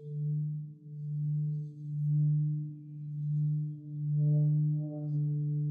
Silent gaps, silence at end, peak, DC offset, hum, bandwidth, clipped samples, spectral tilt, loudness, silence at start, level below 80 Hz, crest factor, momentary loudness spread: none; 0 s; -22 dBFS; under 0.1%; none; 0.8 kHz; under 0.1%; -14.5 dB/octave; -33 LUFS; 0 s; under -90 dBFS; 10 dB; 12 LU